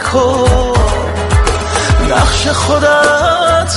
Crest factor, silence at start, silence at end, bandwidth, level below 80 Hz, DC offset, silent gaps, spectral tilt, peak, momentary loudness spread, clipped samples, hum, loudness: 10 dB; 0 s; 0 s; 11.5 kHz; -18 dBFS; under 0.1%; none; -4.5 dB/octave; 0 dBFS; 5 LU; under 0.1%; none; -11 LUFS